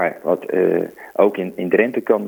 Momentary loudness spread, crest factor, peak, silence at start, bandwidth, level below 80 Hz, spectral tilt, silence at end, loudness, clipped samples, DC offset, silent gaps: 6 LU; 18 dB; 0 dBFS; 0 s; over 20 kHz; -68 dBFS; -8 dB/octave; 0 s; -19 LUFS; under 0.1%; under 0.1%; none